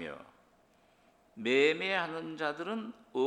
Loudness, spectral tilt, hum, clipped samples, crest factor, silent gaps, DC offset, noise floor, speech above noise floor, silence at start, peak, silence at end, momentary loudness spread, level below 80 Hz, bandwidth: -32 LUFS; -4.5 dB/octave; none; under 0.1%; 20 dB; none; under 0.1%; -67 dBFS; 34 dB; 0 s; -14 dBFS; 0 s; 14 LU; -78 dBFS; 10 kHz